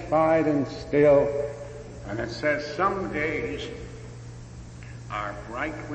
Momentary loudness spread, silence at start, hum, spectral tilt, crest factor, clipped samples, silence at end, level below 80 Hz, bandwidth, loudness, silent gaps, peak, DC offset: 21 LU; 0 s; none; -6.5 dB/octave; 18 dB; under 0.1%; 0 s; -46 dBFS; 8.6 kHz; -25 LUFS; none; -10 dBFS; under 0.1%